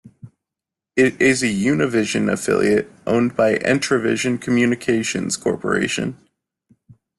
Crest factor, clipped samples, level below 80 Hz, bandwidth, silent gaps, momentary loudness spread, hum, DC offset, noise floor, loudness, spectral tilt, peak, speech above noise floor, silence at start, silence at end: 16 dB; under 0.1%; -54 dBFS; 12.5 kHz; none; 5 LU; none; under 0.1%; -86 dBFS; -19 LUFS; -4.5 dB/octave; -4 dBFS; 68 dB; 0.05 s; 1.05 s